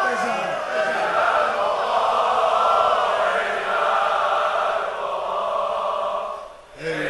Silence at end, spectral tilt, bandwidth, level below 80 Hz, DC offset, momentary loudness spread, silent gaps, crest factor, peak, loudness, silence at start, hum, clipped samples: 0 s; -3 dB/octave; 11.5 kHz; -58 dBFS; under 0.1%; 8 LU; none; 16 dB; -6 dBFS; -21 LUFS; 0 s; none; under 0.1%